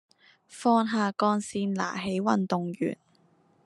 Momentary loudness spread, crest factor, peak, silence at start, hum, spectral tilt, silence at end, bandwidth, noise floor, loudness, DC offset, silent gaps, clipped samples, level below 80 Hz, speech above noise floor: 8 LU; 20 dB; -10 dBFS; 0.5 s; none; -6 dB/octave; 0.7 s; 11.5 kHz; -64 dBFS; -28 LUFS; under 0.1%; none; under 0.1%; -72 dBFS; 37 dB